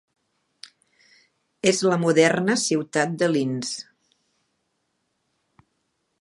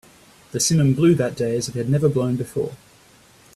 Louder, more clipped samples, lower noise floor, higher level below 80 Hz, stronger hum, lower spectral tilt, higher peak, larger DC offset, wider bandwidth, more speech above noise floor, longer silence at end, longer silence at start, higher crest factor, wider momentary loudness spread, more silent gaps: about the same, -22 LUFS vs -20 LUFS; neither; first, -74 dBFS vs -52 dBFS; second, -74 dBFS vs -54 dBFS; neither; about the same, -4.5 dB/octave vs -5.5 dB/octave; about the same, -4 dBFS vs -6 dBFS; neither; second, 11.5 kHz vs 13.5 kHz; first, 53 dB vs 32 dB; first, 2.4 s vs 0.8 s; first, 1.65 s vs 0.55 s; first, 22 dB vs 16 dB; about the same, 10 LU vs 11 LU; neither